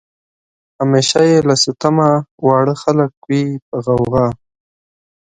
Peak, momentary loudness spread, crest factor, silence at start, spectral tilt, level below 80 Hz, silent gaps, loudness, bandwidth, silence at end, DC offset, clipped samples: 0 dBFS; 9 LU; 16 dB; 0.8 s; -5.5 dB/octave; -48 dBFS; 2.31-2.38 s, 3.17-3.22 s, 3.62-3.72 s; -14 LUFS; 9.6 kHz; 0.9 s; under 0.1%; under 0.1%